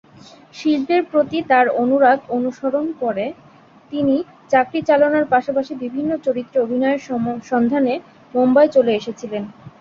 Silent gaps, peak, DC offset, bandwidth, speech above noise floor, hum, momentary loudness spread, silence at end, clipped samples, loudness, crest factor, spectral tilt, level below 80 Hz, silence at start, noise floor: none; -2 dBFS; under 0.1%; 7.2 kHz; 27 dB; none; 11 LU; 0.1 s; under 0.1%; -18 LUFS; 16 dB; -6.5 dB/octave; -60 dBFS; 0.55 s; -45 dBFS